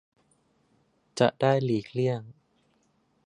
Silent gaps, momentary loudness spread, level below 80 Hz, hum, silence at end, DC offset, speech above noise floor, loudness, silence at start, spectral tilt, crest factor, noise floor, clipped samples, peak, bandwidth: none; 11 LU; -70 dBFS; none; 0.95 s; under 0.1%; 44 dB; -27 LUFS; 1.15 s; -6.5 dB/octave; 24 dB; -69 dBFS; under 0.1%; -6 dBFS; 11 kHz